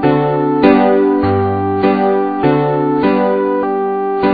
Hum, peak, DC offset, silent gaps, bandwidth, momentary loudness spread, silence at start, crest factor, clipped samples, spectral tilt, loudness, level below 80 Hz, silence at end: none; 0 dBFS; 0.4%; none; 5 kHz; 5 LU; 0 s; 12 dB; under 0.1%; -10.5 dB/octave; -13 LUFS; -46 dBFS; 0 s